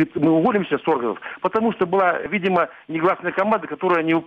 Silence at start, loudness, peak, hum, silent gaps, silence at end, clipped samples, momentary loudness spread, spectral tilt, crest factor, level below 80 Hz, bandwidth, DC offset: 0 s; -20 LUFS; -6 dBFS; none; none; 0 s; under 0.1%; 5 LU; -8.5 dB/octave; 14 dB; -62 dBFS; 5.4 kHz; under 0.1%